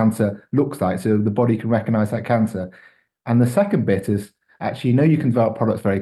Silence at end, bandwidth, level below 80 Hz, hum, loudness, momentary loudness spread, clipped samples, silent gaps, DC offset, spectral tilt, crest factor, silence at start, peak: 0 s; 12.5 kHz; -58 dBFS; none; -20 LUFS; 8 LU; under 0.1%; none; under 0.1%; -8.5 dB/octave; 14 dB; 0 s; -4 dBFS